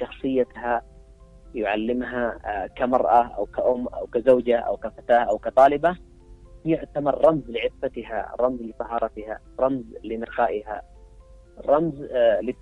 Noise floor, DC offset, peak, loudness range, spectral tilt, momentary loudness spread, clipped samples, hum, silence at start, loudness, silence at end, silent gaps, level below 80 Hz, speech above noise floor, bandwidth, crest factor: -48 dBFS; under 0.1%; -4 dBFS; 6 LU; -7.5 dB/octave; 13 LU; under 0.1%; none; 0 s; -23 LUFS; 0.05 s; none; -48 dBFS; 25 dB; 9.8 kHz; 20 dB